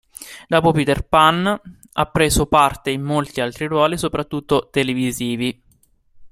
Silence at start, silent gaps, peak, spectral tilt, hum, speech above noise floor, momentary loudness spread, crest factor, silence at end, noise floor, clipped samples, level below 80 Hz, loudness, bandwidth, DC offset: 0.2 s; none; 0 dBFS; -4.5 dB/octave; none; 39 dB; 10 LU; 18 dB; 0.05 s; -57 dBFS; under 0.1%; -38 dBFS; -18 LUFS; 16.5 kHz; under 0.1%